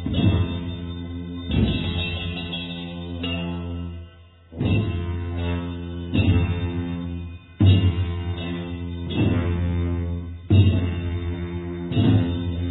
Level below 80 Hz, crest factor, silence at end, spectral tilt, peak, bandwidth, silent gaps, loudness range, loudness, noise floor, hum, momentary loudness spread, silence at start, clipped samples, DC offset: -36 dBFS; 18 dB; 0 s; -10.5 dB/octave; -4 dBFS; 4.1 kHz; none; 5 LU; -24 LUFS; -46 dBFS; none; 13 LU; 0 s; under 0.1%; under 0.1%